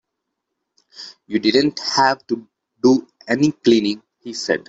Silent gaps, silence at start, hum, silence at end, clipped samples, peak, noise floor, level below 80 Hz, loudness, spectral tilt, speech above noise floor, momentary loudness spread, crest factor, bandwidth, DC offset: none; 1 s; none; 0.1 s; under 0.1%; -2 dBFS; -78 dBFS; -62 dBFS; -18 LUFS; -4.5 dB/octave; 61 dB; 15 LU; 18 dB; 8 kHz; under 0.1%